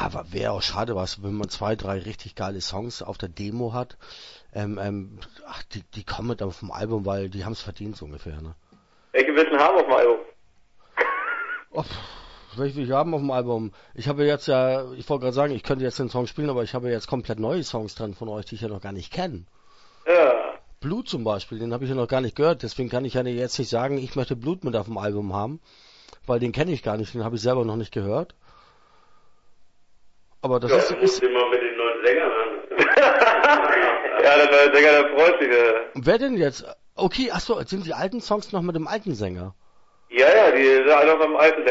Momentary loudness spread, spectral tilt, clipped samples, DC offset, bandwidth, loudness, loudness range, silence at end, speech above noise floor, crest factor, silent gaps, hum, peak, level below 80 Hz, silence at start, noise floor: 19 LU; -5.5 dB/octave; under 0.1%; under 0.1%; 8 kHz; -22 LUFS; 15 LU; 0 s; 35 dB; 20 dB; none; none; -4 dBFS; -50 dBFS; 0 s; -57 dBFS